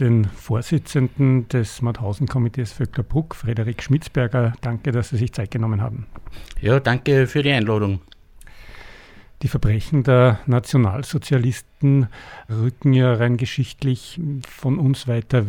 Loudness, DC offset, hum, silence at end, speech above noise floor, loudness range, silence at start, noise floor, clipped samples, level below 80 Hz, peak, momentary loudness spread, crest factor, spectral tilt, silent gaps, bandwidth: -20 LUFS; under 0.1%; none; 0 s; 24 dB; 4 LU; 0 s; -43 dBFS; under 0.1%; -40 dBFS; -4 dBFS; 9 LU; 16 dB; -7.5 dB/octave; none; 12 kHz